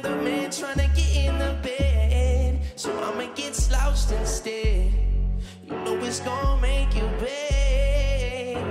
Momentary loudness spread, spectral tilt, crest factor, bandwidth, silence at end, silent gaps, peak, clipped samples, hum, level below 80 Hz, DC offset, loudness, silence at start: 7 LU; -5 dB/octave; 12 dB; 13.5 kHz; 0 s; none; -10 dBFS; under 0.1%; none; -24 dBFS; under 0.1%; -25 LUFS; 0 s